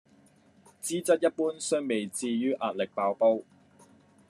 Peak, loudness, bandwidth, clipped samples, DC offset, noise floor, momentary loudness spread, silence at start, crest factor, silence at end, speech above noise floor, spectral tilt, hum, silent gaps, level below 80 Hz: -12 dBFS; -29 LUFS; 13 kHz; under 0.1%; under 0.1%; -61 dBFS; 7 LU; 0.85 s; 18 dB; 0.85 s; 33 dB; -4 dB/octave; none; none; -84 dBFS